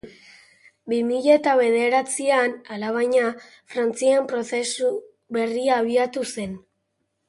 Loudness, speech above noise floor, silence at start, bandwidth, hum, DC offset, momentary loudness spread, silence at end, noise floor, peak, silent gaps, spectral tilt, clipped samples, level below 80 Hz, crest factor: -22 LUFS; 53 dB; 0.05 s; 11.5 kHz; none; under 0.1%; 12 LU; 0.7 s; -74 dBFS; -4 dBFS; none; -3.5 dB/octave; under 0.1%; -66 dBFS; 18 dB